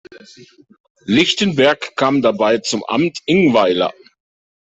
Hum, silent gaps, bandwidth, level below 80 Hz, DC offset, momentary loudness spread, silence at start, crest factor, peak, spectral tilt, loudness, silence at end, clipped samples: none; 0.80-0.84 s, 0.90-0.95 s; 8.4 kHz; -56 dBFS; under 0.1%; 6 LU; 0.1 s; 16 dB; -2 dBFS; -4.5 dB/octave; -15 LUFS; 0.8 s; under 0.1%